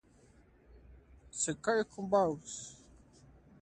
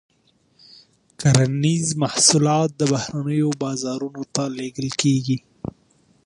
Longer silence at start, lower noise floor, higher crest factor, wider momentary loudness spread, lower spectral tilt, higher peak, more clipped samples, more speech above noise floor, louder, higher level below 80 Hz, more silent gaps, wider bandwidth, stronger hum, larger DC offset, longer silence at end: second, 0.75 s vs 1.2 s; about the same, -63 dBFS vs -61 dBFS; about the same, 20 dB vs 22 dB; first, 15 LU vs 12 LU; about the same, -4 dB/octave vs -4.5 dB/octave; second, -16 dBFS vs 0 dBFS; neither; second, 30 dB vs 41 dB; second, -34 LUFS vs -20 LUFS; second, -64 dBFS vs -54 dBFS; neither; about the same, 11 kHz vs 11.5 kHz; neither; neither; first, 0.85 s vs 0.55 s